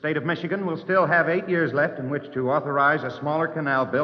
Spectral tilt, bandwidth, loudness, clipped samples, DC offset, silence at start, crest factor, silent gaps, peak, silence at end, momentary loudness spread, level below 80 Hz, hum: -8.5 dB/octave; 6.4 kHz; -23 LUFS; under 0.1%; under 0.1%; 0.05 s; 16 dB; none; -8 dBFS; 0 s; 7 LU; -72 dBFS; none